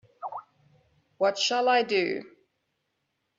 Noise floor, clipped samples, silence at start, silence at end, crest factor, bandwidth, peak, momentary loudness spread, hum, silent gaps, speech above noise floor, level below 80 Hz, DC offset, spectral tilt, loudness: -78 dBFS; under 0.1%; 0.2 s; 1.1 s; 20 dB; 7.8 kHz; -10 dBFS; 16 LU; none; none; 53 dB; -80 dBFS; under 0.1%; -2.5 dB/octave; -26 LUFS